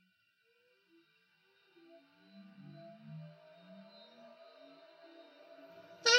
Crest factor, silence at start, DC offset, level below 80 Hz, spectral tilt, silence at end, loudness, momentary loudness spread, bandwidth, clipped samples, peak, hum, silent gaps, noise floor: 30 dB; 3.1 s; under 0.1%; under -90 dBFS; -1 dB/octave; 0 s; -49 LUFS; 14 LU; 12 kHz; under 0.1%; -12 dBFS; none; none; -75 dBFS